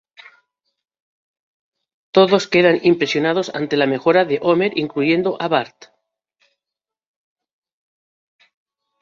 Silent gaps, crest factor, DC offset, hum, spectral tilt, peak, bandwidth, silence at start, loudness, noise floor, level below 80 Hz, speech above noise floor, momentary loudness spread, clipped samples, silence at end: none; 18 dB; under 0.1%; none; -5.5 dB/octave; -2 dBFS; 7.6 kHz; 2.15 s; -17 LUFS; -87 dBFS; -64 dBFS; 71 dB; 6 LU; under 0.1%; 3.35 s